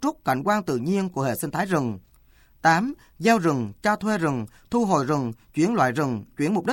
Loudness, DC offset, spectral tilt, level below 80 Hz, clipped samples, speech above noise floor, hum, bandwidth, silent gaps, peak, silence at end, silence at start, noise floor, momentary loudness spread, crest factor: -24 LUFS; under 0.1%; -6 dB/octave; -56 dBFS; under 0.1%; 32 dB; none; 17 kHz; none; -6 dBFS; 0 s; 0 s; -56 dBFS; 7 LU; 18 dB